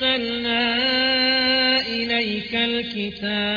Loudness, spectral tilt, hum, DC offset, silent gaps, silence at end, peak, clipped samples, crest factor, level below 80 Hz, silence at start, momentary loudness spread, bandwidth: -20 LUFS; -5 dB/octave; none; under 0.1%; none; 0 s; -8 dBFS; under 0.1%; 14 dB; -54 dBFS; 0 s; 8 LU; 5.4 kHz